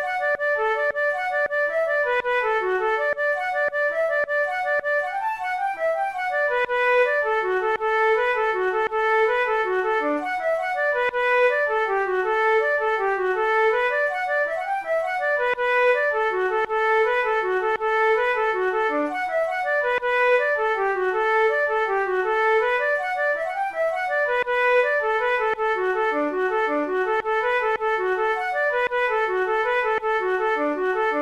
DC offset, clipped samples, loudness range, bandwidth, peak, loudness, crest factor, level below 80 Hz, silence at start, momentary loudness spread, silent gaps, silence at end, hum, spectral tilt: 0.1%; under 0.1%; 2 LU; 12.5 kHz; -10 dBFS; -22 LUFS; 12 dB; -56 dBFS; 0 s; 4 LU; none; 0 s; none; -3.5 dB/octave